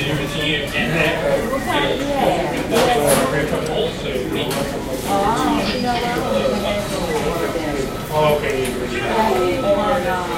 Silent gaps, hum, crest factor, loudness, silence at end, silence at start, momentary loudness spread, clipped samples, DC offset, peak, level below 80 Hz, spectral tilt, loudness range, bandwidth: none; none; 18 dB; -19 LUFS; 0 s; 0 s; 5 LU; under 0.1%; under 0.1%; -2 dBFS; -36 dBFS; -4.5 dB/octave; 2 LU; 16.5 kHz